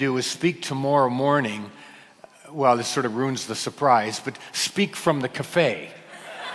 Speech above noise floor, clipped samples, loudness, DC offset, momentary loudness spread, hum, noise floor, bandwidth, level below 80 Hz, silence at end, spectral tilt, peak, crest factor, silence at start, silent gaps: 26 dB; under 0.1%; -23 LUFS; under 0.1%; 15 LU; none; -49 dBFS; 12 kHz; -68 dBFS; 0 s; -4.5 dB/octave; -4 dBFS; 20 dB; 0 s; none